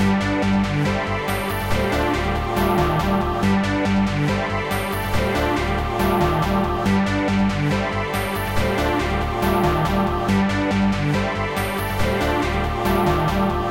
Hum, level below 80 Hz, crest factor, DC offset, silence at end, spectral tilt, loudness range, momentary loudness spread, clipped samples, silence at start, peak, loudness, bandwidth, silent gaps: none; -30 dBFS; 14 dB; under 0.1%; 0 s; -6 dB/octave; 0 LU; 4 LU; under 0.1%; 0 s; -6 dBFS; -21 LUFS; 17 kHz; none